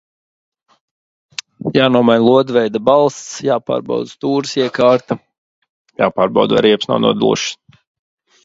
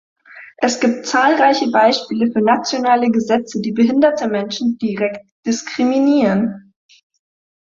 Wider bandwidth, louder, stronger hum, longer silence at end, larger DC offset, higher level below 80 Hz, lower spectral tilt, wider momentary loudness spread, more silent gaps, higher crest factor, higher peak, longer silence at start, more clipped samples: about the same, 8 kHz vs 7.6 kHz; about the same, -15 LUFS vs -16 LUFS; neither; second, 0.9 s vs 1.15 s; neither; about the same, -56 dBFS vs -60 dBFS; about the same, -5 dB/octave vs -4.5 dB/octave; first, 14 LU vs 8 LU; first, 5.38-5.62 s, 5.69-5.85 s vs 5.32-5.43 s; about the same, 16 dB vs 16 dB; about the same, 0 dBFS vs -2 dBFS; first, 1.65 s vs 0.35 s; neither